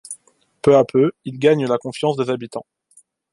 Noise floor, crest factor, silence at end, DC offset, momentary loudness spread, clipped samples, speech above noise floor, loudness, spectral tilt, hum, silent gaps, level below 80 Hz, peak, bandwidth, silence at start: -55 dBFS; 18 dB; 0.7 s; under 0.1%; 19 LU; under 0.1%; 38 dB; -18 LUFS; -6.5 dB/octave; none; none; -60 dBFS; -2 dBFS; 11.5 kHz; 0.1 s